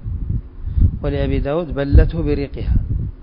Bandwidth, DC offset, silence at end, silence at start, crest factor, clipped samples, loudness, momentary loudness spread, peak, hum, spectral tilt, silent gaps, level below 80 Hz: 5.2 kHz; under 0.1%; 0 s; 0 s; 18 dB; under 0.1%; -20 LUFS; 10 LU; 0 dBFS; none; -12.5 dB/octave; none; -20 dBFS